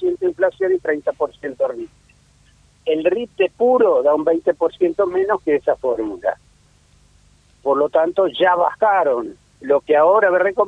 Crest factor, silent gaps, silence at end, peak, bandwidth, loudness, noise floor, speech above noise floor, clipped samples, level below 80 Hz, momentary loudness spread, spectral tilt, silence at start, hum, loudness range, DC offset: 16 dB; none; 0 s; -2 dBFS; 9 kHz; -18 LUFS; -54 dBFS; 37 dB; under 0.1%; -56 dBFS; 10 LU; -6 dB/octave; 0 s; 50 Hz at -55 dBFS; 5 LU; under 0.1%